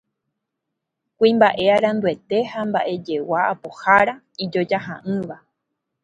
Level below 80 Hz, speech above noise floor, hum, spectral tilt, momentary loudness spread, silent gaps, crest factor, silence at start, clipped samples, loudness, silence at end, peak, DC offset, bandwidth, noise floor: -62 dBFS; 61 dB; none; -6.5 dB/octave; 11 LU; none; 20 dB; 1.2 s; under 0.1%; -20 LUFS; 0.65 s; 0 dBFS; under 0.1%; 9.4 kHz; -80 dBFS